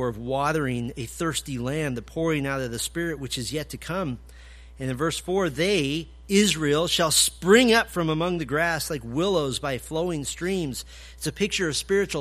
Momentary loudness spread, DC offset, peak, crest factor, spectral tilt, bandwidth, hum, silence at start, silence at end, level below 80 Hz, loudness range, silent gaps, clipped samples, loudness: 12 LU; under 0.1%; -4 dBFS; 22 dB; -3.5 dB/octave; 15.5 kHz; none; 0 s; 0 s; -46 dBFS; 8 LU; none; under 0.1%; -25 LUFS